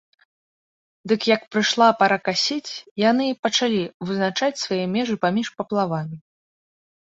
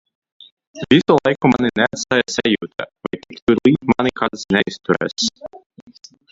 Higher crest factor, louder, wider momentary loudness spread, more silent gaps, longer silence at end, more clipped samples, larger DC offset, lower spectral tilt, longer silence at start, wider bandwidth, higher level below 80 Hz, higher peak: about the same, 20 dB vs 18 dB; second, -21 LUFS vs -17 LUFS; second, 11 LU vs 14 LU; first, 2.91-2.96 s, 3.39-3.43 s, 3.94-4.00 s vs 3.42-3.47 s; about the same, 0.85 s vs 0.75 s; neither; neither; about the same, -4 dB/octave vs -5 dB/octave; first, 1.05 s vs 0.75 s; about the same, 8 kHz vs 7.8 kHz; second, -66 dBFS vs -50 dBFS; second, -4 dBFS vs 0 dBFS